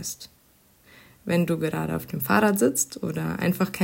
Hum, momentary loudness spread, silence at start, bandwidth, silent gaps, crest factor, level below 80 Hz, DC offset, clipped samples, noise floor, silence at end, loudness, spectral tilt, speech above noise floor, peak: none; 14 LU; 0 s; 16.5 kHz; none; 20 dB; -58 dBFS; under 0.1%; under 0.1%; -59 dBFS; 0 s; -25 LUFS; -5 dB/octave; 35 dB; -6 dBFS